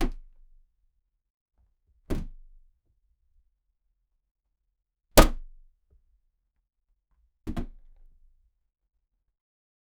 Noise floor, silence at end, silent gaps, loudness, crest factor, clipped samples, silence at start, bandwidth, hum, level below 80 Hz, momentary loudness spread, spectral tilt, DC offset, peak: -76 dBFS; 2.3 s; 1.30-1.46 s, 4.31-4.35 s; -26 LUFS; 32 dB; under 0.1%; 0 s; 16 kHz; none; -34 dBFS; 26 LU; -4 dB/octave; under 0.1%; 0 dBFS